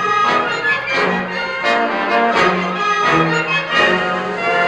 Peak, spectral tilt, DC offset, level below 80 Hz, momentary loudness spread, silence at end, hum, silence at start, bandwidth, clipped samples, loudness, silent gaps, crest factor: -2 dBFS; -4.5 dB/octave; under 0.1%; -52 dBFS; 5 LU; 0 s; none; 0 s; 11.5 kHz; under 0.1%; -15 LUFS; none; 14 dB